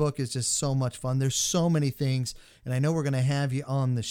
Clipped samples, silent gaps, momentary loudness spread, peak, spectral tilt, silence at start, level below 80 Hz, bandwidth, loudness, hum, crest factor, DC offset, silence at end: under 0.1%; none; 5 LU; -12 dBFS; -5 dB/octave; 0 s; -56 dBFS; 16.5 kHz; -27 LUFS; none; 14 dB; under 0.1%; 0 s